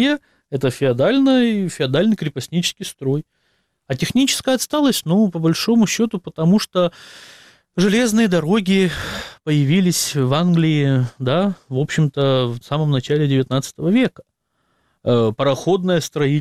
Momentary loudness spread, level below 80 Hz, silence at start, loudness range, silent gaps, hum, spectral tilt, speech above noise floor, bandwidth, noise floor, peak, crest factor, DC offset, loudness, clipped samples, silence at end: 7 LU; -52 dBFS; 0 s; 2 LU; none; none; -5.5 dB/octave; 50 dB; 16 kHz; -67 dBFS; -4 dBFS; 14 dB; under 0.1%; -18 LUFS; under 0.1%; 0 s